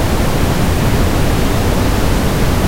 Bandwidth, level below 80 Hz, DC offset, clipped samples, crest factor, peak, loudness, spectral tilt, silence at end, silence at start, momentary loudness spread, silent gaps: 16 kHz; -18 dBFS; under 0.1%; under 0.1%; 12 dB; 0 dBFS; -15 LUFS; -5.5 dB/octave; 0 s; 0 s; 1 LU; none